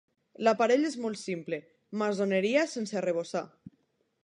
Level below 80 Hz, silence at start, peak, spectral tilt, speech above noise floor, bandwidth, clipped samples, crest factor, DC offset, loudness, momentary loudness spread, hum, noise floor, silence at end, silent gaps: -82 dBFS; 0.4 s; -12 dBFS; -5 dB/octave; 44 dB; 11 kHz; under 0.1%; 20 dB; under 0.1%; -30 LUFS; 12 LU; none; -73 dBFS; 0.55 s; none